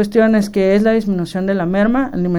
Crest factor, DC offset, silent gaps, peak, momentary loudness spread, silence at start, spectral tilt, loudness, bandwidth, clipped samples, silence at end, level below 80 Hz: 14 dB; under 0.1%; none; -2 dBFS; 6 LU; 0 s; -7.5 dB/octave; -15 LUFS; 12.5 kHz; under 0.1%; 0 s; -38 dBFS